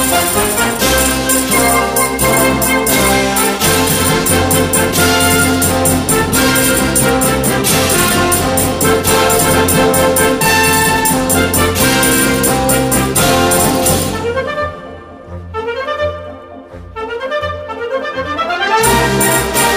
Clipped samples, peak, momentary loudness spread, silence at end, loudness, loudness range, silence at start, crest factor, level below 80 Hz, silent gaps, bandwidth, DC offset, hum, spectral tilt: under 0.1%; 0 dBFS; 10 LU; 0 s; -11 LUFS; 9 LU; 0 s; 12 dB; -30 dBFS; none; 16 kHz; under 0.1%; none; -3 dB/octave